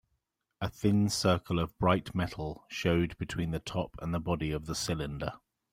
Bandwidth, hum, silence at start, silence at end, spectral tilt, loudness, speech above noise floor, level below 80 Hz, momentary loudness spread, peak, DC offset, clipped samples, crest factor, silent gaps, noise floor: 16 kHz; none; 0.6 s; 0.35 s; -5.5 dB/octave; -32 LUFS; 49 dB; -50 dBFS; 11 LU; -12 dBFS; under 0.1%; under 0.1%; 20 dB; none; -81 dBFS